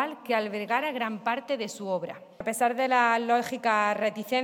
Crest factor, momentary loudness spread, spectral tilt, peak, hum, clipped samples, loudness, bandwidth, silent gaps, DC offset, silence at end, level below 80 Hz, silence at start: 18 dB; 9 LU; -3.5 dB/octave; -10 dBFS; none; under 0.1%; -27 LUFS; 17.5 kHz; none; under 0.1%; 0 s; -74 dBFS; 0 s